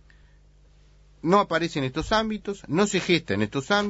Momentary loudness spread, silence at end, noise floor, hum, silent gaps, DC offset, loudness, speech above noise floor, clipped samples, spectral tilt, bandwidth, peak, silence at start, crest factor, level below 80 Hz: 8 LU; 0 s; -55 dBFS; 50 Hz at -50 dBFS; none; under 0.1%; -24 LUFS; 31 dB; under 0.1%; -5 dB/octave; 8 kHz; -6 dBFS; 1.25 s; 20 dB; -48 dBFS